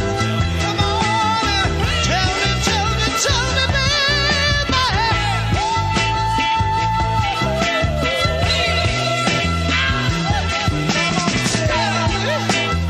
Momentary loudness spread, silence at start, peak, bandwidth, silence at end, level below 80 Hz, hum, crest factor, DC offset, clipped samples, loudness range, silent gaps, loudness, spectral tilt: 3 LU; 0 s; -2 dBFS; 15.5 kHz; 0 s; -28 dBFS; none; 16 dB; under 0.1%; under 0.1%; 2 LU; none; -17 LUFS; -4 dB/octave